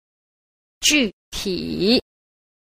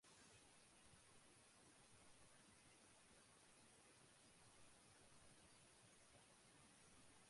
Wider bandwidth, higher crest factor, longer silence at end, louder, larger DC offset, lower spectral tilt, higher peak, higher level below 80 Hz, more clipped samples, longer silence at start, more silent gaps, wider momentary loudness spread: first, 15.5 kHz vs 11.5 kHz; first, 22 dB vs 14 dB; first, 0.7 s vs 0 s; first, -20 LUFS vs -69 LUFS; neither; about the same, -2.5 dB/octave vs -2.5 dB/octave; first, -2 dBFS vs -56 dBFS; first, -46 dBFS vs -86 dBFS; neither; first, 0.8 s vs 0 s; first, 1.13-1.32 s vs none; first, 9 LU vs 1 LU